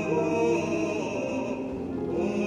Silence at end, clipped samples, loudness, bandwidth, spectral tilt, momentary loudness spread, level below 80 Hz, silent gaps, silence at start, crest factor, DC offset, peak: 0 s; under 0.1%; -28 LUFS; 10.5 kHz; -6.5 dB/octave; 7 LU; -56 dBFS; none; 0 s; 14 dB; under 0.1%; -14 dBFS